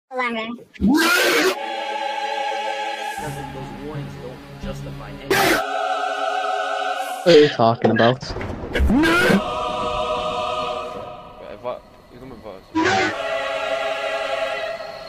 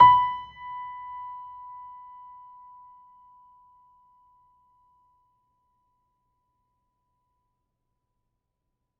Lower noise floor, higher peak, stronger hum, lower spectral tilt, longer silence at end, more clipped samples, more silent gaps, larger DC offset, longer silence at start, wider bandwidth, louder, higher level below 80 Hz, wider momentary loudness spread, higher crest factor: second, -42 dBFS vs -81 dBFS; first, 0 dBFS vs -4 dBFS; neither; first, -4.5 dB/octave vs -1 dB/octave; second, 0 s vs 7.6 s; neither; neither; neither; about the same, 0.1 s vs 0 s; first, 16 kHz vs 4.3 kHz; first, -20 LUFS vs -26 LUFS; first, -38 dBFS vs -64 dBFS; second, 18 LU vs 24 LU; second, 20 dB vs 26 dB